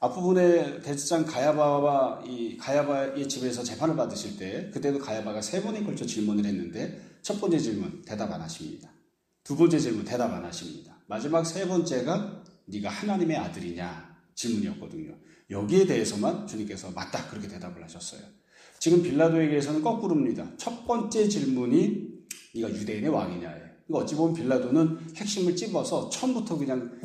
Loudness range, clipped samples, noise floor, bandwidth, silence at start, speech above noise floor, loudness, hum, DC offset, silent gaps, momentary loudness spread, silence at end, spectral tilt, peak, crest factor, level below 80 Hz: 5 LU; under 0.1%; -67 dBFS; 14 kHz; 0 s; 40 dB; -28 LUFS; none; under 0.1%; none; 16 LU; 0 s; -5.5 dB/octave; -10 dBFS; 18 dB; -66 dBFS